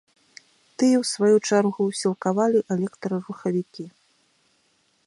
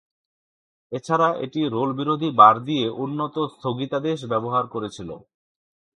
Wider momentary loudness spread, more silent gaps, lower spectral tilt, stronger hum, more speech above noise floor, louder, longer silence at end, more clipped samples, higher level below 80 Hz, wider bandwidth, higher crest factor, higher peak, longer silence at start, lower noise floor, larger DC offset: second, 15 LU vs 19 LU; neither; about the same, -5.5 dB/octave vs -6.5 dB/octave; neither; second, 44 dB vs over 68 dB; about the same, -23 LUFS vs -21 LUFS; first, 1.15 s vs 0.8 s; neither; second, -76 dBFS vs -64 dBFS; about the same, 11.5 kHz vs 10.5 kHz; about the same, 18 dB vs 22 dB; second, -6 dBFS vs 0 dBFS; about the same, 0.8 s vs 0.9 s; second, -66 dBFS vs under -90 dBFS; neither